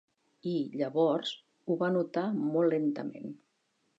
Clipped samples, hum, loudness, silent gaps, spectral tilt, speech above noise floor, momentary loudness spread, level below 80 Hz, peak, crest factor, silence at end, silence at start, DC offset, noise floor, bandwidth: under 0.1%; none; -31 LUFS; none; -7.5 dB/octave; 46 dB; 13 LU; -86 dBFS; -14 dBFS; 18 dB; 0.65 s; 0.45 s; under 0.1%; -76 dBFS; 7.8 kHz